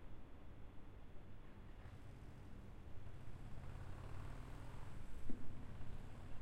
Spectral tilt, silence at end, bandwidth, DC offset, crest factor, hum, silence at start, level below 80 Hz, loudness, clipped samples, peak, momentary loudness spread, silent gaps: -7 dB/octave; 0 s; 9.2 kHz; under 0.1%; 18 dB; none; 0 s; -54 dBFS; -57 LUFS; under 0.1%; -26 dBFS; 7 LU; none